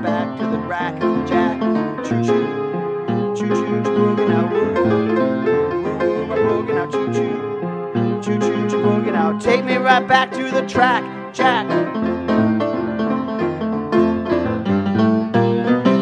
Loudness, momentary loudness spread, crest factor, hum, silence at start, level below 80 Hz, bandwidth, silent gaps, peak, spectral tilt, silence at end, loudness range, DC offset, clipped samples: -18 LUFS; 6 LU; 18 dB; none; 0 s; -52 dBFS; 9.4 kHz; none; 0 dBFS; -7 dB/octave; 0 s; 3 LU; under 0.1%; under 0.1%